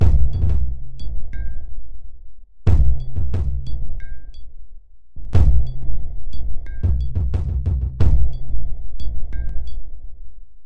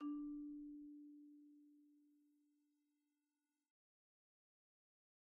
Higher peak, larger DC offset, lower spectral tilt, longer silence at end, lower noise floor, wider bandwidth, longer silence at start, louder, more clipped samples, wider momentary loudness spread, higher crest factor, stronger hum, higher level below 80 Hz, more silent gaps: first, -2 dBFS vs -40 dBFS; neither; first, -9 dB/octave vs -4.5 dB/octave; second, 0 s vs 3 s; second, -37 dBFS vs under -90 dBFS; first, 4.9 kHz vs 2.1 kHz; about the same, 0 s vs 0 s; first, -24 LUFS vs -54 LUFS; neither; first, 21 LU vs 18 LU; about the same, 12 dB vs 16 dB; neither; first, -22 dBFS vs -84 dBFS; neither